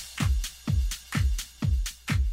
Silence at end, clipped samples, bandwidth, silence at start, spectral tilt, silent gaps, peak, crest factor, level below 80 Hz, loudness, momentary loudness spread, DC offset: 0 s; under 0.1%; 16 kHz; 0 s; -4.5 dB/octave; none; -16 dBFS; 12 dB; -30 dBFS; -29 LUFS; 2 LU; under 0.1%